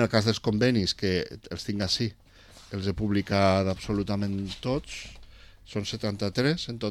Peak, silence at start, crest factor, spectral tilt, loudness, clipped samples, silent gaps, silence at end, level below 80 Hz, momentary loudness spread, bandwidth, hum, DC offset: -8 dBFS; 0 s; 20 dB; -5.5 dB/octave; -28 LUFS; under 0.1%; none; 0 s; -50 dBFS; 13 LU; 14 kHz; none; under 0.1%